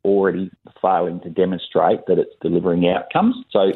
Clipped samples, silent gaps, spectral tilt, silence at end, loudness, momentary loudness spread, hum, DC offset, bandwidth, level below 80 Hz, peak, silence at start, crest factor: under 0.1%; none; -10 dB/octave; 0 s; -19 LUFS; 5 LU; none; under 0.1%; 4.2 kHz; -58 dBFS; -2 dBFS; 0.05 s; 16 dB